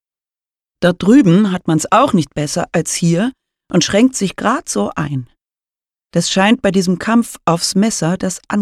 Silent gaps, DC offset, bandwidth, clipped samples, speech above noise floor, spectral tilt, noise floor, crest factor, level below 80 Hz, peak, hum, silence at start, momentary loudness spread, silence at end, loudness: none; under 0.1%; 14 kHz; under 0.1%; over 76 dB; -5 dB/octave; under -90 dBFS; 14 dB; -48 dBFS; -2 dBFS; none; 0.8 s; 8 LU; 0 s; -15 LUFS